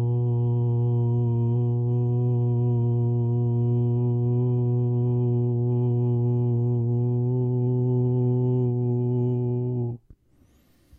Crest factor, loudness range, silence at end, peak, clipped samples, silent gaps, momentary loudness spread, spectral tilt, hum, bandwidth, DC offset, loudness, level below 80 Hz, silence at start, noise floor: 8 dB; 1 LU; 1 s; -14 dBFS; under 0.1%; none; 1 LU; -13.5 dB/octave; none; 1.2 kHz; under 0.1%; -24 LUFS; -56 dBFS; 0 s; -60 dBFS